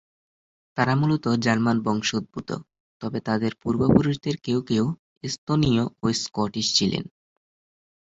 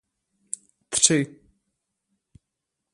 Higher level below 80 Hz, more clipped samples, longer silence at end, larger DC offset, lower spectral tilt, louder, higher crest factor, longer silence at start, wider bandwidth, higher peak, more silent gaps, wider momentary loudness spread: first, -50 dBFS vs -66 dBFS; neither; second, 1.05 s vs 1.65 s; neither; first, -5 dB/octave vs -2.5 dB/octave; second, -24 LUFS vs -21 LUFS; second, 20 dB vs 26 dB; second, 0.75 s vs 0.9 s; second, 8 kHz vs 11.5 kHz; about the same, -4 dBFS vs -2 dBFS; first, 2.80-3.00 s, 4.99-5.21 s, 5.38-5.47 s vs none; second, 12 LU vs 18 LU